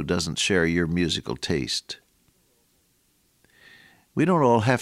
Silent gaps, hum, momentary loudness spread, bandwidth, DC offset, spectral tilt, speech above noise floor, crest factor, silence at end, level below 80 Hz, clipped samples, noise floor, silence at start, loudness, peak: none; none; 11 LU; 15 kHz; under 0.1%; -4.5 dB/octave; 43 dB; 20 dB; 0 s; -50 dBFS; under 0.1%; -66 dBFS; 0 s; -23 LUFS; -6 dBFS